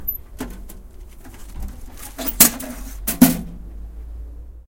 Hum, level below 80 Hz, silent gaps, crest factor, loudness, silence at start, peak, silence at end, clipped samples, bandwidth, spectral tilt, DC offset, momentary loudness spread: none; -34 dBFS; none; 22 dB; -17 LUFS; 0 s; 0 dBFS; 0.05 s; under 0.1%; 17 kHz; -3 dB/octave; under 0.1%; 25 LU